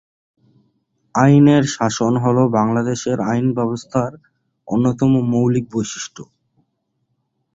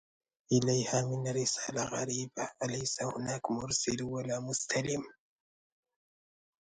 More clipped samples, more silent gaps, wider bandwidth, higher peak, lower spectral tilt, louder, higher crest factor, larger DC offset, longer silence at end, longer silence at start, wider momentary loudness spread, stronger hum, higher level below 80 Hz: neither; neither; second, 8 kHz vs 9.6 kHz; first, -2 dBFS vs -16 dBFS; first, -6.5 dB/octave vs -4 dB/octave; first, -17 LUFS vs -33 LUFS; about the same, 16 dB vs 20 dB; neither; second, 1.3 s vs 1.55 s; first, 1.15 s vs 0.5 s; first, 12 LU vs 7 LU; neither; first, -52 dBFS vs -66 dBFS